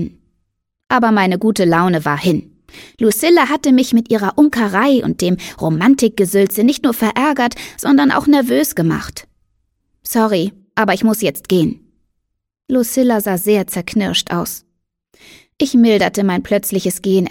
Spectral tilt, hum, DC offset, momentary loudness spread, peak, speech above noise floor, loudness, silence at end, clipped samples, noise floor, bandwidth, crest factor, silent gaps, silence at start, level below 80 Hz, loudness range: -5 dB/octave; none; under 0.1%; 8 LU; 0 dBFS; 58 dB; -15 LUFS; 0 s; under 0.1%; -72 dBFS; 17.5 kHz; 14 dB; none; 0 s; -48 dBFS; 4 LU